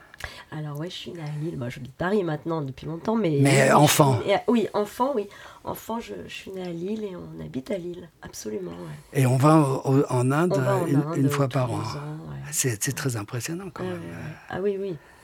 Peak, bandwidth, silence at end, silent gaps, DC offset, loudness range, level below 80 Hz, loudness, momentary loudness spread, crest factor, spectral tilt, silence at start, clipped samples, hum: -2 dBFS; 19 kHz; 0.25 s; none; under 0.1%; 10 LU; -58 dBFS; -25 LUFS; 18 LU; 24 dB; -5.5 dB/octave; 0.2 s; under 0.1%; none